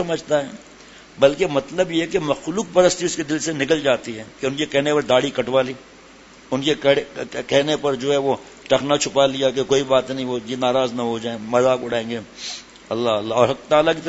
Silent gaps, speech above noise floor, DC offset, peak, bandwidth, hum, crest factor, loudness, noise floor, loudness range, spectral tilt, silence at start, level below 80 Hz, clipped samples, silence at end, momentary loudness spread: none; 26 dB; under 0.1%; 0 dBFS; 8 kHz; none; 20 dB; -20 LUFS; -45 dBFS; 2 LU; -4 dB/octave; 0 s; -54 dBFS; under 0.1%; 0 s; 10 LU